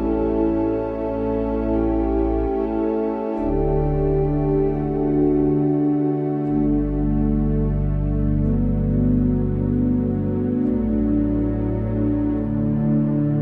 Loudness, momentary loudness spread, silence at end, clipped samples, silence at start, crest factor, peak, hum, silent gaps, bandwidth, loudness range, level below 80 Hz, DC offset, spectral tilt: -21 LUFS; 3 LU; 0 s; under 0.1%; 0 s; 12 dB; -8 dBFS; none; none; 3.7 kHz; 1 LU; -28 dBFS; under 0.1%; -12.5 dB/octave